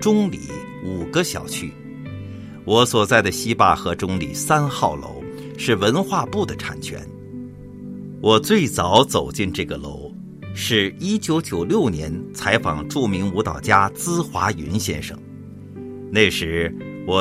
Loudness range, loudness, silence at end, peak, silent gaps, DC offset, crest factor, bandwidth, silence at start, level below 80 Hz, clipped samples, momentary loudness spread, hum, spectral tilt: 3 LU; -20 LUFS; 0 s; 0 dBFS; none; under 0.1%; 20 dB; 16 kHz; 0 s; -46 dBFS; under 0.1%; 19 LU; none; -4.5 dB/octave